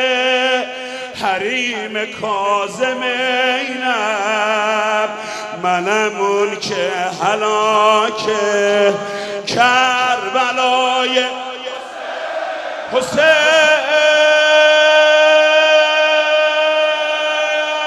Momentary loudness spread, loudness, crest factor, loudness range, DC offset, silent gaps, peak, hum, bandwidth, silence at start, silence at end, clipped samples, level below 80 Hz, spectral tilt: 13 LU; -14 LUFS; 14 dB; 7 LU; under 0.1%; none; 0 dBFS; none; 12.5 kHz; 0 s; 0 s; under 0.1%; -62 dBFS; -2 dB/octave